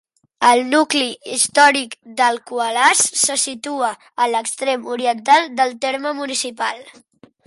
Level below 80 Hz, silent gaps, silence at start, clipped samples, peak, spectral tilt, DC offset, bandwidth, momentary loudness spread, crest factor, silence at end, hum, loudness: -72 dBFS; none; 0.4 s; under 0.1%; -2 dBFS; 0 dB/octave; under 0.1%; 12 kHz; 10 LU; 18 dB; 0.55 s; none; -17 LUFS